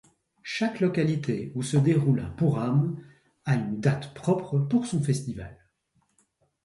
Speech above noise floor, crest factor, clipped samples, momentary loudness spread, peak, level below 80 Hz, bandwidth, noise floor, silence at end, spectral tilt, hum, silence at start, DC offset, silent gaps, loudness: 46 dB; 18 dB; under 0.1%; 13 LU; -10 dBFS; -56 dBFS; 11.5 kHz; -71 dBFS; 1.1 s; -7 dB/octave; none; 0.45 s; under 0.1%; none; -27 LUFS